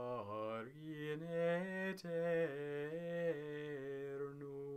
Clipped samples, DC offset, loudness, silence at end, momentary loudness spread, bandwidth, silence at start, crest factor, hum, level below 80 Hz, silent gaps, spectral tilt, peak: under 0.1%; under 0.1%; -43 LUFS; 0 s; 9 LU; 14 kHz; 0 s; 14 dB; none; -82 dBFS; none; -7 dB/octave; -28 dBFS